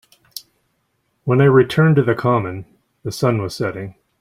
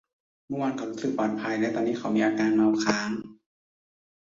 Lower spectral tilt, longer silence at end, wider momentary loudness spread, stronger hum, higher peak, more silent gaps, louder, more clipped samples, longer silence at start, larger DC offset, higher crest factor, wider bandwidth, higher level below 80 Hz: first, -7.5 dB/octave vs -5 dB/octave; second, 0.3 s vs 0.95 s; first, 22 LU vs 8 LU; neither; first, -2 dBFS vs -8 dBFS; neither; first, -17 LUFS vs -27 LUFS; neither; second, 0.35 s vs 0.5 s; neither; about the same, 16 dB vs 18 dB; first, 15.5 kHz vs 7.6 kHz; first, -54 dBFS vs -68 dBFS